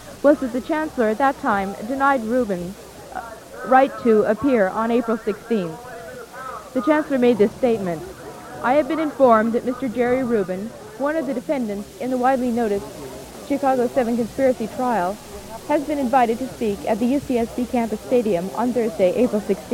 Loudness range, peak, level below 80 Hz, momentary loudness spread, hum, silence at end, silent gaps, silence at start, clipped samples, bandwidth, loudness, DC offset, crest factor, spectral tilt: 3 LU; -2 dBFS; -50 dBFS; 16 LU; none; 0 s; none; 0 s; under 0.1%; 16.5 kHz; -21 LUFS; under 0.1%; 18 dB; -6 dB/octave